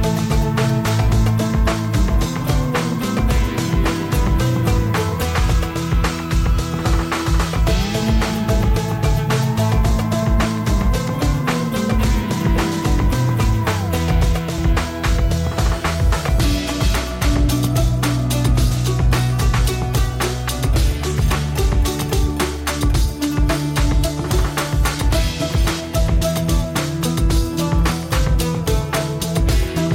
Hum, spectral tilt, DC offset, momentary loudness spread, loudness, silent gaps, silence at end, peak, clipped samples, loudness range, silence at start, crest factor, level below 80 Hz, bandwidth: none; -5.5 dB/octave; under 0.1%; 2 LU; -19 LUFS; none; 0 s; -8 dBFS; under 0.1%; 1 LU; 0 s; 10 dB; -20 dBFS; 17 kHz